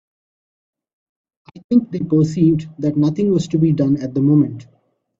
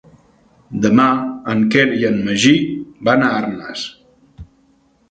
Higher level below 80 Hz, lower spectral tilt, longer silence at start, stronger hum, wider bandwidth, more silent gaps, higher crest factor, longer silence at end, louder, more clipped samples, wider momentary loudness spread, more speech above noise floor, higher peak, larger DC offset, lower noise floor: about the same, -54 dBFS vs -50 dBFS; first, -9 dB/octave vs -5 dB/octave; first, 1.55 s vs 0.7 s; neither; second, 7.8 kHz vs 9.2 kHz; first, 1.64-1.69 s vs none; about the same, 14 dB vs 18 dB; about the same, 0.55 s vs 0.65 s; about the same, -17 LUFS vs -16 LUFS; neither; second, 5 LU vs 13 LU; first, over 74 dB vs 41 dB; second, -4 dBFS vs 0 dBFS; neither; first, under -90 dBFS vs -56 dBFS